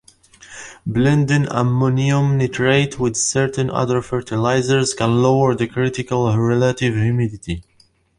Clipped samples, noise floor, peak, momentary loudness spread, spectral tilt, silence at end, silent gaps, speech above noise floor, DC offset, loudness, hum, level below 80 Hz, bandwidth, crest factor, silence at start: under 0.1%; -57 dBFS; -2 dBFS; 8 LU; -5.5 dB/octave; 0.55 s; none; 40 dB; under 0.1%; -18 LUFS; none; -46 dBFS; 11.5 kHz; 16 dB; 0.4 s